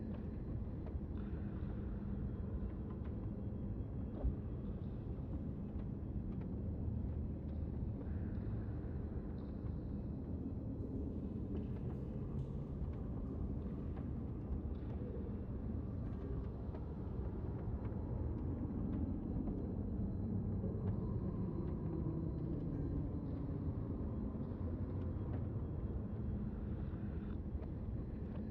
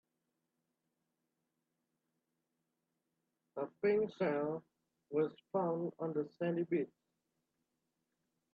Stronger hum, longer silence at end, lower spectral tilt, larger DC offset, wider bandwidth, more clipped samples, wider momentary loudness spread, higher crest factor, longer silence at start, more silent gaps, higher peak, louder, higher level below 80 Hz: neither; second, 0 s vs 1.7 s; first, -11.5 dB/octave vs -9.5 dB/octave; neither; second, 4.3 kHz vs 4.9 kHz; neither; second, 4 LU vs 11 LU; about the same, 14 dB vs 18 dB; second, 0 s vs 3.55 s; neither; about the same, -26 dBFS vs -24 dBFS; second, -44 LUFS vs -38 LUFS; first, -48 dBFS vs -86 dBFS